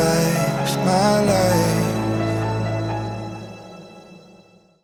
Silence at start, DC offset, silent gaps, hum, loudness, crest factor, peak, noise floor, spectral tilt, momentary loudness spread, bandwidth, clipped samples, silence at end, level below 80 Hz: 0 s; under 0.1%; none; none; -20 LUFS; 14 dB; -6 dBFS; -51 dBFS; -5.5 dB/octave; 19 LU; 19.5 kHz; under 0.1%; 0.65 s; -44 dBFS